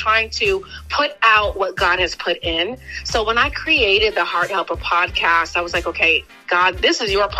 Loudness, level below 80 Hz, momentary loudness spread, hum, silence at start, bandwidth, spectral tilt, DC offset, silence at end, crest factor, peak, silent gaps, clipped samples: -17 LUFS; -38 dBFS; 8 LU; none; 0 s; 15.5 kHz; -3 dB/octave; under 0.1%; 0 s; 18 dB; 0 dBFS; none; under 0.1%